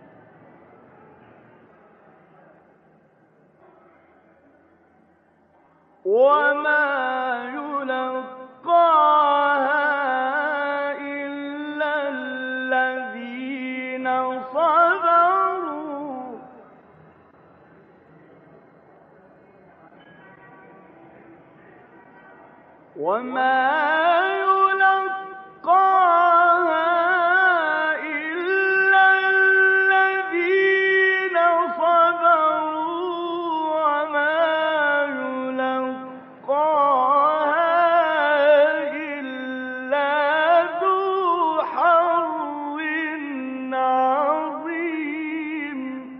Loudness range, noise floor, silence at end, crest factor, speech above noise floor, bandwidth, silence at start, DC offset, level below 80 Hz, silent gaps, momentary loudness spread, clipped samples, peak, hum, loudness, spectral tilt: 8 LU; -59 dBFS; 0 s; 16 dB; 40 dB; 5.8 kHz; 6.05 s; under 0.1%; -76 dBFS; none; 13 LU; under 0.1%; -6 dBFS; none; -20 LUFS; 0 dB/octave